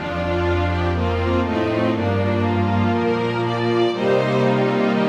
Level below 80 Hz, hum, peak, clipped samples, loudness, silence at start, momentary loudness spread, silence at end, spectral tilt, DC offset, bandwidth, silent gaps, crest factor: -38 dBFS; none; -6 dBFS; under 0.1%; -20 LUFS; 0 s; 3 LU; 0 s; -7.5 dB/octave; under 0.1%; 8.6 kHz; none; 12 dB